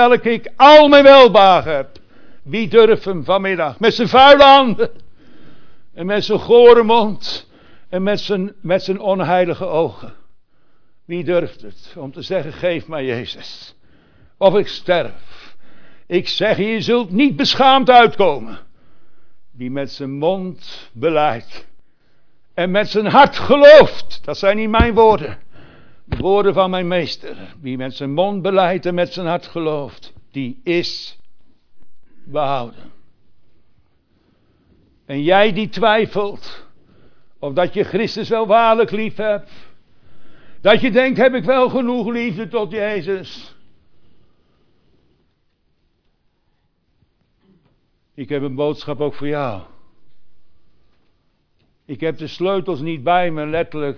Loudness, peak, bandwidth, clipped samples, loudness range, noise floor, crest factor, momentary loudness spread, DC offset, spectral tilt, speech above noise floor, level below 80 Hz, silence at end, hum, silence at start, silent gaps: -14 LUFS; 0 dBFS; 5.4 kHz; 0.2%; 15 LU; -63 dBFS; 16 dB; 20 LU; under 0.1%; -6 dB/octave; 49 dB; -42 dBFS; 0 s; none; 0 s; none